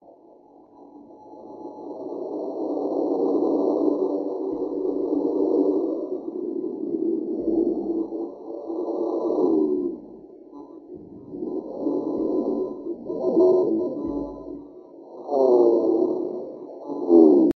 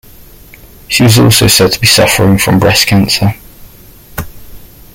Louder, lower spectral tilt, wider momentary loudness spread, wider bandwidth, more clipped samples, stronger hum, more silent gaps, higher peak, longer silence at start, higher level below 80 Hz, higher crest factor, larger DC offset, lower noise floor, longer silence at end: second, -24 LUFS vs -7 LUFS; first, -10 dB/octave vs -4 dB/octave; about the same, 21 LU vs 19 LU; second, 5.8 kHz vs 17.5 kHz; second, under 0.1% vs 0.1%; neither; neither; second, -4 dBFS vs 0 dBFS; about the same, 0.8 s vs 0.9 s; second, -60 dBFS vs -32 dBFS; first, 20 dB vs 10 dB; neither; first, -51 dBFS vs -36 dBFS; second, 0.05 s vs 0.3 s